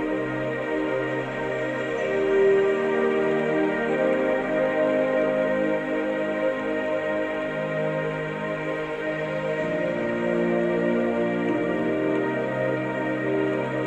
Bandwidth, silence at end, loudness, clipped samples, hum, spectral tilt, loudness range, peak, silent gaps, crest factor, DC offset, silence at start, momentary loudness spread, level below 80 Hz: 8.8 kHz; 0 s; -25 LUFS; under 0.1%; none; -7 dB/octave; 4 LU; -10 dBFS; none; 14 dB; under 0.1%; 0 s; 5 LU; -56 dBFS